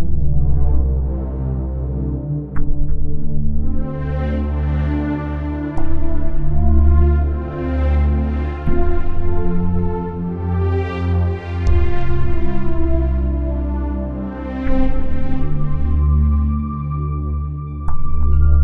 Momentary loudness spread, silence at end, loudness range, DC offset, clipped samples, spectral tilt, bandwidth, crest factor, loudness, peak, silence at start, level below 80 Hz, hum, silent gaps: 7 LU; 0 s; 4 LU; under 0.1%; under 0.1%; -10.5 dB/octave; 3.5 kHz; 12 dB; -21 LUFS; -2 dBFS; 0 s; -18 dBFS; none; none